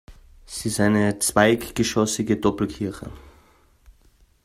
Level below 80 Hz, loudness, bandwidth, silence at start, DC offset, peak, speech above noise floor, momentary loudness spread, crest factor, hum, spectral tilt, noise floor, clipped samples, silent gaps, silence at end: -48 dBFS; -22 LUFS; 15.5 kHz; 0.1 s; under 0.1%; -2 dBFS; 36 dB; 13 LU; 22 dB; none; -4.5 dB/octave; -57 dBFS; under 0.1%; none; 0.55 s